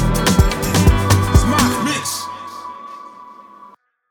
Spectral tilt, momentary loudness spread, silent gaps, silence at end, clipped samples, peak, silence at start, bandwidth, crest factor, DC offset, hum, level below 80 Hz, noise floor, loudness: -5 dB/octave; 20 LU; none; 0.7 s; under 0.1%; 0 dBFS; 0 s; over 20 kHz; 16 dB; under 0.1%; none; -24 dBFS; -46 dBFS; -16 LUFS